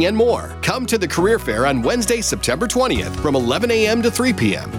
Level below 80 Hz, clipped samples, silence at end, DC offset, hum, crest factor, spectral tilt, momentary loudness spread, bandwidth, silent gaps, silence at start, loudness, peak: -36 dBFS; under 0.1%; 0 s; under 0.1%; none; 12 dB; -4 dB/octave; 4 LU; 17.5 kHz; none; 0 s; -18 LUFS; -6 dBFS